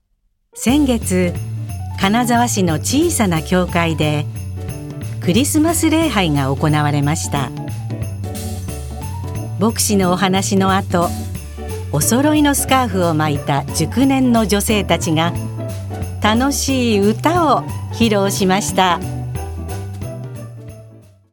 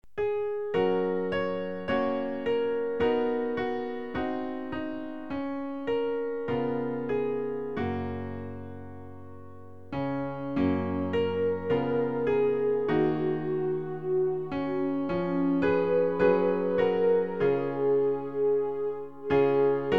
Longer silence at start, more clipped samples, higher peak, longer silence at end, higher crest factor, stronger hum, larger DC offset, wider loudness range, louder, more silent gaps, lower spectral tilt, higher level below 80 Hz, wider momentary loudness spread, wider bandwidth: first, 0.55 s vs 0.15 s; neither; first, 0 dBFS vs -12 dBFS; first, 0.3 s vs 0 s; about the same, 16 dB vs 18 dB; neither; second, under 0.1% vs 0.5%; second, 3 LU vs 7 LU; first, -17 LUFS vs -28 LUFS; neither; second, -5 dB/octave vs -9 dB/octave; first, -36 dBFS vs -58 dBFS; first, 13 LU vs 10 LU; first, 18 kHz vs 5.8 kHz